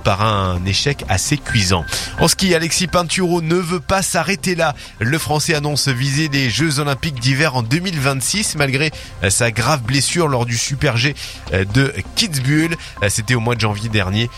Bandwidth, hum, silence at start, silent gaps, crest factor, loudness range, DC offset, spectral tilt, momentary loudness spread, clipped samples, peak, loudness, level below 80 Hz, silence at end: 16 kHz; none; 0 s; none; 16 dB; 1 LU; under 0.1%; -4 dB/octave; 4 LU; under 0.1%; 0 dBFS; -17 LUFS; -38 dBFS; 0 s